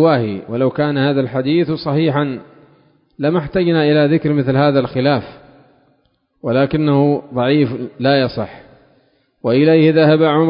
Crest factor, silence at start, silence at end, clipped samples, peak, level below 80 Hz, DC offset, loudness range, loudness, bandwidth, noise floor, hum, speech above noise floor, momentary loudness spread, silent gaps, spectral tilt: 14 dB; 0 s; 0 s; under 0.1%; -2 dBFS; -50 dBFS; under 0.1%; 2 LU; -15 LUFS; 5.4 kHz; -61 dBFS; none; 47 dB; 9 LU; none; -12.5 dB/octave